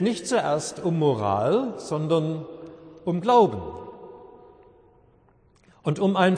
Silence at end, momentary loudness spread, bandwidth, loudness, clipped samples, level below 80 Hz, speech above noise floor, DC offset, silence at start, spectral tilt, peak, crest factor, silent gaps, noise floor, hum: 0 s; 22 LU; 10.5 kHz; -24 LUFS; under 0.1%; -60 dBFS; 36 dB; under 0.1%; 0 s; -6 dB/octave; -6 dBFS; 18 dB; none; -59 dBFS; none